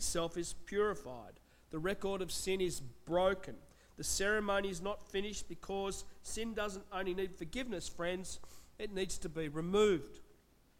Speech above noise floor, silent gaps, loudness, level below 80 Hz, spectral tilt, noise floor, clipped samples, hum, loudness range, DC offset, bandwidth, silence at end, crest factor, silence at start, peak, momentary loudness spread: 28 dB; none; -38 LUFS; -54 dBFS; -3.5 dB/octave; -66 dBFS; under 0.1%; none; 4 LU; under 0.1%; 16.5 kHz; 0.45 s; 18 dB; 0 s; -20 dBFS; 14 LU